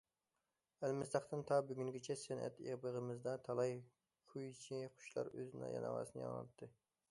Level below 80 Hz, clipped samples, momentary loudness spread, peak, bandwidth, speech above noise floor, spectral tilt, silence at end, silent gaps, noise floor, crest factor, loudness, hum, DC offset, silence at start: -82 dBFS; under 0.1%; 12 LU; -24 dBFS; 11.5 kHz; over 45 dB; -6 dB/octave; 0.4 s; none; under -90 dBFS; 20 dB; -45 LUFS; none; under 0.1%; 0.8 s